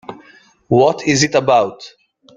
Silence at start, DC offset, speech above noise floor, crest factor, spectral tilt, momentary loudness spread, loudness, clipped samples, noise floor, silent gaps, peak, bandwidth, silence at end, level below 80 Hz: 0.1 s; under 0.1%; 34 dB; 16 dB; -4.5 dB/octave; 9 LU; -14 LUFS; under 0.1%; -48 dBFS; none; 0 dBFS; 9.6 kHz; 0.5 s; -52 dBFS